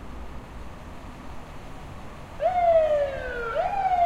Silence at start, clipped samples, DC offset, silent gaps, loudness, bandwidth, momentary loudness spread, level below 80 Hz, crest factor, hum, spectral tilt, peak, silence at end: 0 s; under 0.1%; under 0.1%; none; -24 LUFS; 11.5 kHz; 22 LU; -42 dBFS; 16 dB; none; -6 dB/octave; -12 dBFS; 0 s